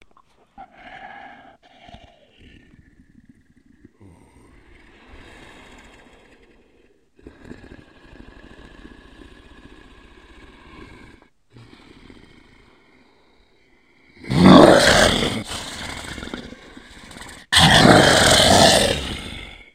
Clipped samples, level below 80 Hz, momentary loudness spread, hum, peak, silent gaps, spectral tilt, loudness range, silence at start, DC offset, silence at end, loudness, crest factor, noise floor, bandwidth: under 0.1%; -40 dBFS; 28 LU; none; 0 dBFS; none; -4 dB/octave; 3 LU; 0.6 s; under 0.1%; 0.3 s; -13 LUFS; 22 dB; -58 dBFS; 16 kHz